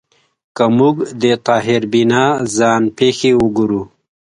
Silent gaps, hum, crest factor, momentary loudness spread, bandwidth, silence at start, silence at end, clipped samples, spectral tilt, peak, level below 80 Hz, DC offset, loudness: none; none; 14 dB; 6 LU; 11 kHz; 0.55 s; 0.45 s; under 0.1%; -5 dB/octave; 0 dBFS; -50 dBFS; under 0.1%; -14 LUFS